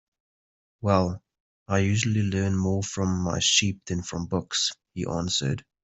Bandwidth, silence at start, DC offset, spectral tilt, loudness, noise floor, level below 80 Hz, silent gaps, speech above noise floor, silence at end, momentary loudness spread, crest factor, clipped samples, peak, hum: 8.4 kHz; 0.8 s; under 0.1%; -4 dB/octave; -26 LUFS; under -90 dBFS; -56 dBFS; 1.40-1.66 s; over 65 dB; 0.2 s; 10 LU; 22 dB; under 0.1%; -6 dBFS; none